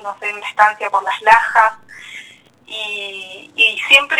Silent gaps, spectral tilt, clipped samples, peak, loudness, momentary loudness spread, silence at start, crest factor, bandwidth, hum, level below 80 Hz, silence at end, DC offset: none; 0.5 dB/octave; under 0.1%; 0 dBFS; -14 LUFS; 22 LU; 0 s; 16 dB; 20 kHz; none; -56 dBFS; 0 s; under 0.1%